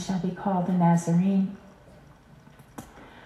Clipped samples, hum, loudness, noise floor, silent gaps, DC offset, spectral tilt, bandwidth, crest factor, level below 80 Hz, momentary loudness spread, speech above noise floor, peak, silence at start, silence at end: under 0.1%; none; -25 LUFS; -52 dBFS; none; under 0.1%; -7.5 dB/octave; 11.5 kHz; 16 dB; -60 dBFS; 24 LU; 28 dB; -12 dBFS; 0 s; 0.05 s